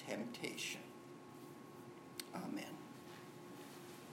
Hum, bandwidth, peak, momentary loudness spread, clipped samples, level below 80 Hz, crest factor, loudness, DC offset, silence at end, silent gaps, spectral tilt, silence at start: none; 16 kHz; -26 dBFS; 11 LU; under 0.1%; -90 dBFS; 24 dB; -50 LUFS; under 0.1%; 0 s; none; -3.5 dB/octave; 0 s